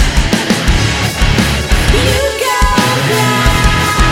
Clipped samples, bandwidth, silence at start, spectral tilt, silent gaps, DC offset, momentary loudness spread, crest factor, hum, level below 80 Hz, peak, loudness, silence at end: under 0.1%; 17 kHz; 0 s; -4 dB/octave; none; under 0.1%; 2 LU; 10 dB; none; -16 dBFS; 0 dBFS; -11 LUFS; 0 s